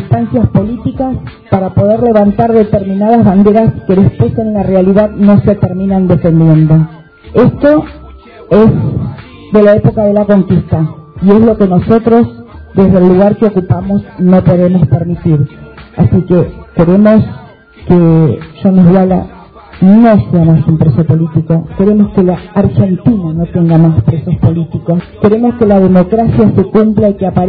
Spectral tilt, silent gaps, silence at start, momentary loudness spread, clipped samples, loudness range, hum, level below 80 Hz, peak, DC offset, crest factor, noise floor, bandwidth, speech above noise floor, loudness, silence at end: -12.5 dB/octave; none; 0 s; 8 LU; 2%; 2 LU; none; -32 dBFS; 0 dBFS; 0.2%; 8 dB; -32 dBFS; 4.8 kHz; 24 dB; -9 LUFS; 0 s